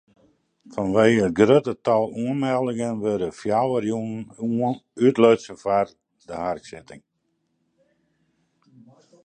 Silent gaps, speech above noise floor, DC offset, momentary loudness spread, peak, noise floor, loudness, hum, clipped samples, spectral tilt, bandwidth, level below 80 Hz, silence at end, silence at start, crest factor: none; 51 dB; under 0.1%; 13 LU; -2 dBFS; -73 dBFS; -22 LUFS; none; under 0.1%; -6.5 dB/octave; 9.4 kHz; -58 dBFS; 2.25 s; 0.7 s; 20 dB